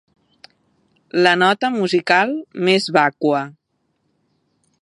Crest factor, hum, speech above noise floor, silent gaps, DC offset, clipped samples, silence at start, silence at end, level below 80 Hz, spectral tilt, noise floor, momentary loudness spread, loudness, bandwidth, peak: 20 dB; none; 52 dB; none; under 0.1%; under 0.1%; 1.15 s; 1.3 s; -72 dBFS; -5 dB/octave; -69 dBFS; 8 LU; -17 LUFS; 11 kHz; 0 dBFS